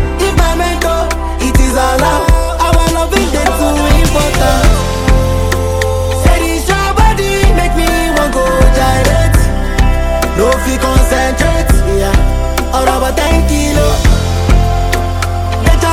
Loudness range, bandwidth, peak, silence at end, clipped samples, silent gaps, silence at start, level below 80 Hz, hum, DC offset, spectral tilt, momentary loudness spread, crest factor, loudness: 1 LU; 16.5 kHz; 0 dBFS; 0 s; under 0.1%; none; 0 s; -12 dBFS; none; under 0.1%; -5 dB/octave; 4 LU; 10 dB; -12 LUFS